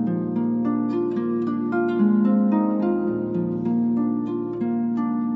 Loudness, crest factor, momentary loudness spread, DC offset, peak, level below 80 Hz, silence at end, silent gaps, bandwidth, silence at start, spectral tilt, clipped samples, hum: -23 LUFS; 12 dB; 6 LU; under 0.1%; -10 dBFS; -64 dBFS; 0 s; none; 4.1 kHz; 0 s; -11 dB/octave; under 0.1%; none